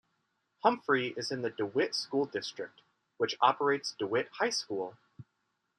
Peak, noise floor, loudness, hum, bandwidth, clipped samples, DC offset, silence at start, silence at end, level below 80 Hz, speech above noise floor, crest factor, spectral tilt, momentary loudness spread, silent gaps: -10 dBFS; -80 dBFS; -32 LUFS; none; 11.5 kHz; under 0.1%; under 0.1%; 0.65 s; 0.55 s; -82 dBFS; 49 dB; 24 dB; -3.5 dB/octave; 10 LU; none